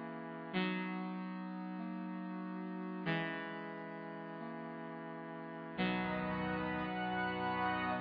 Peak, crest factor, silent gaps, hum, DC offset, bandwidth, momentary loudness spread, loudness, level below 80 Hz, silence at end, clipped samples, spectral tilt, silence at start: -24 dBFS; 16 dB; none; none; under 0.1%; 5.2 kHz; 10 LU; -41 LUFS; -68 dBFS; 0 s; under 0.1%; -4.5 dB/octave; 0 s